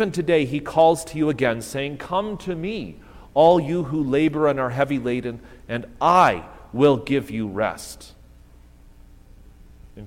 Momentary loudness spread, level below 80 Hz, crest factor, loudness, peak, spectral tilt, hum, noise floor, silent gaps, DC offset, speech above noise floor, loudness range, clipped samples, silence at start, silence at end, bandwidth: 15 LU; -48 dBFS; 20 dB; -21 LUFS; -2 dBFS; -6 dB/octave; 60 Hz at -50 dBFS; -48 dBFS; none; under 0.1%; 27 dB; 5 LU; under 0.1%; 0 s; 0 s; 16.5 kHz